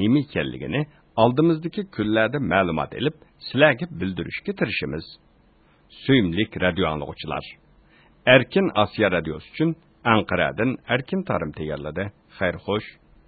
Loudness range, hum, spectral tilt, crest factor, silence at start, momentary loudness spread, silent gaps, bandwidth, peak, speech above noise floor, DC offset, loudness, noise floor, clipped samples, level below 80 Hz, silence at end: 4 LU; none; -11 dB/octave; 22 dB; 0 s; 12 LU; none; 4.8 kHz; 0 dBFS; 35 dB; under 0.1%; -23 LUFS; -57 dBFS; under 0.1%; -48 dBFS; 0.35 s